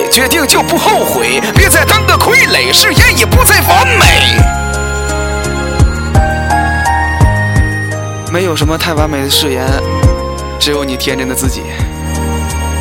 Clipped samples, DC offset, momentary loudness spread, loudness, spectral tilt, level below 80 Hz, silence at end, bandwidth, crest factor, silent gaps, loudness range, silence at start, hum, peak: 0.6%; under 0.1%; 10 LU; -9 LUFS; -3.5 dB/octave; -18 dBFS; 0 s; 20 kHz; 10 dB; none; 6 LU; 0 s; none; 0 dBFS